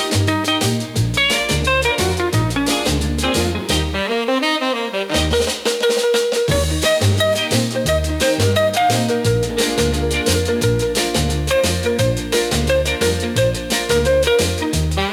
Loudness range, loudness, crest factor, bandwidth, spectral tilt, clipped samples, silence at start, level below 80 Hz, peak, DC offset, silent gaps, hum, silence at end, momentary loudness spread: 1 LU; -17 LUFS; 14 dB; 19 kHz; -4 dB/octave; under 0.1%; 0 s; -30 dBFS; -4 dBFS; under 0.1%; none; none; 0 s; 3 LU